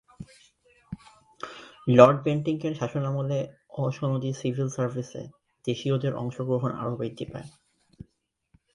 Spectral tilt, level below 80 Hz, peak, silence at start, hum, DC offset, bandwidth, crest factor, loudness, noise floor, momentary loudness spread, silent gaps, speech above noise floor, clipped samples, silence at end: -7.5 dB/octave; -62 dBFS; 0 dBFS; 0.2 s; none; under 0.1%; 11 kHz; 26 dB; -26 LUFS; -72 dBFS; 24 LU; none; 46 dB; under 0.1%; 1.25 s